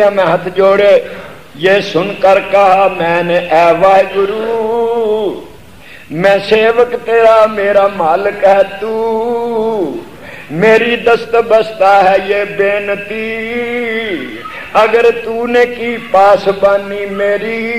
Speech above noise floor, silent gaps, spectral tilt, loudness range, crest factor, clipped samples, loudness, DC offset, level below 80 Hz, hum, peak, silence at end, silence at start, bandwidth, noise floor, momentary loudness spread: 25 dB; none; -5.5 dB/octave; 3 LU; 10 dB; under 0.1%; -11 LUFS; 1%; -48 dBFS; none; 0 dBFS; 0 s; 0 s; 15 kHz; -36 dBFS; 10 LU